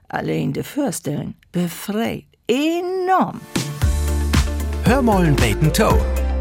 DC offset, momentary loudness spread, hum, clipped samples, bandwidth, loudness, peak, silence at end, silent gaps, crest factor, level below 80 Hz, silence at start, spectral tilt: under 0.1%; 9 LU; none; under 0.1%; 17 kHz; -20 LUFS; -6 dBFS; 0 s; none; 14 dB; -26 dBFS; 0.15 s; -5.5 dB/octave